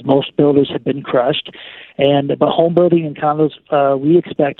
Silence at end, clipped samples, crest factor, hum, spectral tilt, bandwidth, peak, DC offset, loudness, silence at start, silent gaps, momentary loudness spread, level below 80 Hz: 0.05 s; under 0.1%; 14 dB; none; -10 dB/octave; 4.2 kHz; 0 dBFS; under 0.1%; -15 LUFS; 0 s; none; 8 LU; -56 dBFS